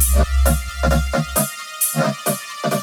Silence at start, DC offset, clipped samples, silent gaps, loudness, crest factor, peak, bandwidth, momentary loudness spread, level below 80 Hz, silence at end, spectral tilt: 0 s; under 0.1%; under 0.1%; none; -19 LUFS; 16 dB; -2 dBFS; 19.5 kHz; 6 LU; -22 dBFS; 0 s; -4.5 dB/octave